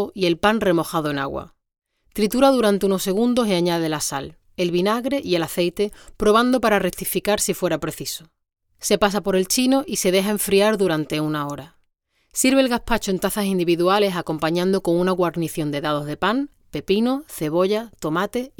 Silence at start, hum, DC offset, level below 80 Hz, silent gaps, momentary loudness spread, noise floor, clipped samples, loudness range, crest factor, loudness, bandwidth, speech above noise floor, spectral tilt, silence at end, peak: 0 s; none; under 0.1%; -46 dBFS; none; 9 LU; -68 dBFS; under 0.1%; 2 LU; 18 dB; -21 LUFS; over 20 kHz; 47 dB; -4.5 dB/octave; 0.1 s; -2 dBFS